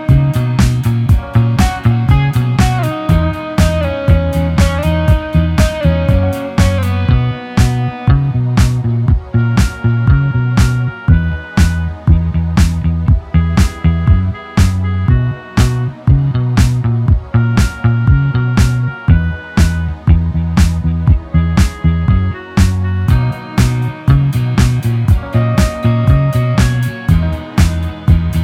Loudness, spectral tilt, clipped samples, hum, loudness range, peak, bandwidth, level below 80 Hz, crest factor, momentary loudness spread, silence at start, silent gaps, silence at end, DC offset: -13 LUFS; -7 dB/octave; under 0.1%; none; 1 LU; 0 dBFS; 15 kHz; -18 dBFS; 12 dB; 3 LU; 0 s; none; 0 s; under 0.1%